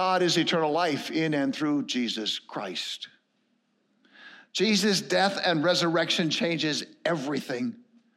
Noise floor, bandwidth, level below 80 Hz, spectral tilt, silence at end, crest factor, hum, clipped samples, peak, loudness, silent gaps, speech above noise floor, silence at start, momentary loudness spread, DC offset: -72 dBFS; 15.5 kHz; -84 dBFS; -4 dB/octave; 0.4 s; 18 dB; none; under 0.1%; -10 dBFS; -26 LUFS; none; 45 dB; 0 s; 9 LU; under 0.1%